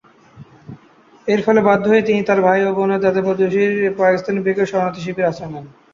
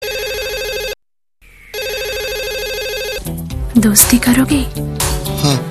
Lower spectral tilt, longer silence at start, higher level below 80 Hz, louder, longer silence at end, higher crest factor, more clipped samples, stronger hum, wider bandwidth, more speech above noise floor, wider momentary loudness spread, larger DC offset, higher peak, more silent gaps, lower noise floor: first, -7 dB/octave vs -3.5 dB/octave; first, 0.35 s vs 0 s; second, -58 dBFS vs -28 dBFS; about the same, -16 LUFS vs -15 LUFS; first, 0.25 s vs 0 s; about the same, 16 dB vs 16 dB; neither; neither; second, 7.4 kHz vs 15.5 kHz; second, 33 dB vs 44 dB; second, 8 LU vs 15 LU; second, under 0.1% vs 0.2%; about the same, -2 dBFS vs 0 dBFS; neither; second, -49 dBFS vs -57 dBFS